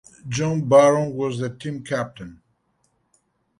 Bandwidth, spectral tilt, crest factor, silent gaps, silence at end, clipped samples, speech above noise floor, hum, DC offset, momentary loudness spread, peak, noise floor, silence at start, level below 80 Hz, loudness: 11.5 kHz; -6 dB/octave; 20 dB; none; 1.25 s; under 0.1%; 48 dB; none; under 0.1%; 18 LU; -2 dBFS; -68 dBFS; 0.25 s; -58 dBFS; -21 LUFS